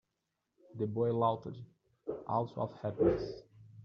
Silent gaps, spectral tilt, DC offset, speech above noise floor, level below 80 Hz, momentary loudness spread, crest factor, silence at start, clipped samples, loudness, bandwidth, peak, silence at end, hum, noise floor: none; -8 dB/octave; under 0.1%; 51 dB; -60 dBFS; 17 LU; 20 dB; 0.75 s; under 0.1%; -35 LUFS; 6.6 kHz; -16 dBFS; 0 s; none; -85 dBFS